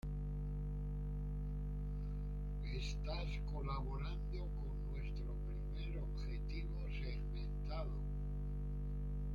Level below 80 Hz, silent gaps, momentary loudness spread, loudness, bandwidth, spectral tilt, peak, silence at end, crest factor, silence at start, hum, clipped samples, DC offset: -42 dBFS; none; 2 LU; -45 LUFS; 7.2 kHz; -7.5 dB/octave; -30 dBFS; 0 s; 12 dB; 0.05 s; 50 Hz at -40 dBFS; under 0.1%; under 0.1%